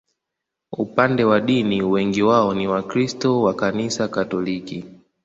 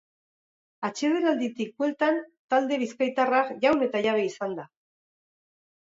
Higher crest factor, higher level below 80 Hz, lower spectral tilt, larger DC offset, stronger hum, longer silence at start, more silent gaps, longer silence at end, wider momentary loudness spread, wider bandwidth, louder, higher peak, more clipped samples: about the same, 20 dB vs 18 dB; first, -56 dBFS vs -74 dBFS; first, -6 dB/octave vs -4.5 dB/octave; neither; neither; about the same, 0.7 s vs 0.8 s; second, none vs 2.39-2.49 s; second, 0.3 s vs 1.2 s; about the same, 11 LU vs 10 LU; about the same, 8 kHz vs 7.8 kHz; first, -20 LUFS vs -26 LUFS; first, 0 dBFS vs -10 dBFS; neither